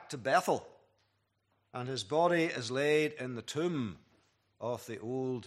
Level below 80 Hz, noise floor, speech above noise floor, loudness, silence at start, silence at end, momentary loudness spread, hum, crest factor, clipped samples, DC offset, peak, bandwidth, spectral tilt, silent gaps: -78 dBFS; -77 dBFS; 44 dB; -33 LUFS; 0 s; 0 s; 12 LU; none; 20 dB; under 0.1%; under 0.1%; -14 dBFS; 14.5 kHz; -5 dB/octave; none